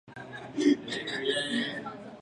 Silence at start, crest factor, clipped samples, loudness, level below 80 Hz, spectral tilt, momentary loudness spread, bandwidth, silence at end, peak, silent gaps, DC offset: 0.05 s; 18 dB; under 0.1%; -30 LUFS; -70 dBFS; -4 dB/octave; 15 LU; 11 kHz; 0 s; -12 dBFS; none; under 0.1%